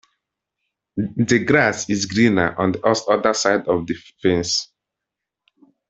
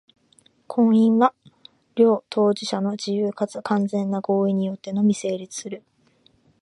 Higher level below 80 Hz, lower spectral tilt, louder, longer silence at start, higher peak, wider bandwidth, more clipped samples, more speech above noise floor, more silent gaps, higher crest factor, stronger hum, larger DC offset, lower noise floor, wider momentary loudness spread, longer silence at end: first, -54 dBFS vs -72 dBFS; second, -4.5 dB/octave vs -6.5 dB/octave; first, -19 LUFS vs -22 LUFS; first, 0.95 s vs 0.7 s; about the same, -2 dBFS vs -4 dBFS; second, 8.4 kHz vs 11.5 kHz; neither; first, 65 dB vs 40 dB; neither; about the same, 20 dB vs 18 dB; neither; neither; first, -84 dBFS vs -60 dBFS; about the same, 10 LU vs 12 LU; first, 1.25 s vs 0.85 s